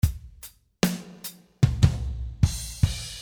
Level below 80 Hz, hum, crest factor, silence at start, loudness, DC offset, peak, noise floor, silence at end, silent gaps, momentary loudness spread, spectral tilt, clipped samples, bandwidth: -32 dBFS; none; 22 dB; 0.05 s; -26 LUFS; under 0.1%; -4 dBFS; -49 dBFS; 0 s; none; 19 LU; -5.5 dB/octave; under 0.1%; over 20 kHz